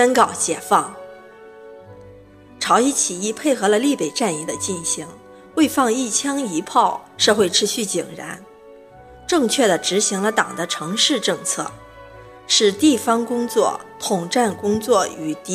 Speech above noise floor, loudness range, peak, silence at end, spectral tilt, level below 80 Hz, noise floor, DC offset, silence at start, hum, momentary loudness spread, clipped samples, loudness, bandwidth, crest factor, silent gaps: 25 dB; 2 LU; 0 dBFS; 0 s; -2.5 dB/octave; -58 dBFS; -44 dBFS; under 0.1%; 0 s; none; 10 LU; under 0.1%; -19 LUFS; 16 kHz; 20 dB; none